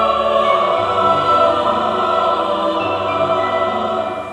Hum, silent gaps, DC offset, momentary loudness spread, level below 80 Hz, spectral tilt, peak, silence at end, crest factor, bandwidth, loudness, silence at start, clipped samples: none; none; under 0.1%; 5 LU; -48 dBFS; -5.5 dB/octave; -2 dBFS; 0 s; 14 dB; 10.5 kHz; -16 LUFS; 0 s; under 0.1%